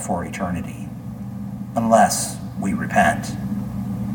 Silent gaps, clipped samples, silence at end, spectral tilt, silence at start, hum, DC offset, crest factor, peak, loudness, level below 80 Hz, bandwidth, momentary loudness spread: none; under 0.1%; 0 s; -5 dB/octave; 0 s; none; under 0.1%; 20 dB; -2 dBFS; -22 LUFS; -44 dBFS; 19 kHz; 16 LU